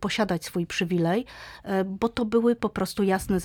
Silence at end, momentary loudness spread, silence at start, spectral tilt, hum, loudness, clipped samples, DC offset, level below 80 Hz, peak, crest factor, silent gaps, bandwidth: 0 s; 6 LU; 0 s; -5.5 dB/octave; none; -26 LUFS; under 0.1%; under 0.1%; -50 dBFS; -10 dBFS; 16 dB; none; 19 kHz